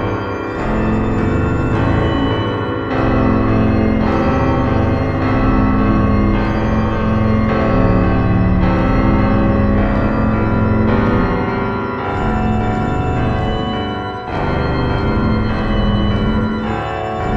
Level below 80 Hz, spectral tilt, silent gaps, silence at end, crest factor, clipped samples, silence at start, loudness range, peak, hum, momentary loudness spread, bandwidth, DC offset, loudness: -22 dBFS; -8.5 dB/octave; none; 0 s; 14 dB; under 0.1%; 0 s; 3 LU; 0 dBFS; none; 6 LU; 7.6 kHz; 0.1%; -16 LUFS